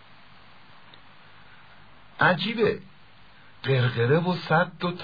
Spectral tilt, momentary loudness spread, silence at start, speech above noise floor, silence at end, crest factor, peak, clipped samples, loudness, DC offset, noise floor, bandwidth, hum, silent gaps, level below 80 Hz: -8.5 dB/octave; 6 LU; 2.2 s; 31 dB; 0 s; 20 dB; -8 dBFS; under 0.1%; -24 LUFS; 0.3%; -54 dBFS; 5 kHz; none; none; -62 dBFS